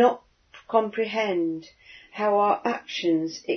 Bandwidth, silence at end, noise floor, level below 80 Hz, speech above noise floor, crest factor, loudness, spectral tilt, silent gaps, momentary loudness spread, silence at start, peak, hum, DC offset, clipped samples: 6.6 kHz; 0 s; -53 dBFS; -70 dBFS; 28 dB; 18 dB; -25 LUFS; -5 dB/octave; none; 10 LU; 0 s; -6 dBFS; none; under 0.1%; under 0.1%